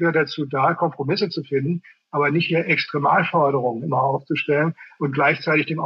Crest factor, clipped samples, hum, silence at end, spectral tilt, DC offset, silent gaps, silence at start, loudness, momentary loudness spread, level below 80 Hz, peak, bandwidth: 14 dB; under 0.1%; none; 0 s; -8 dB/octave; under 0.1%; none; 0 s; -21 LUFS; 6 LU; -74 dBFS; -6 dBFS; 6.4 kHz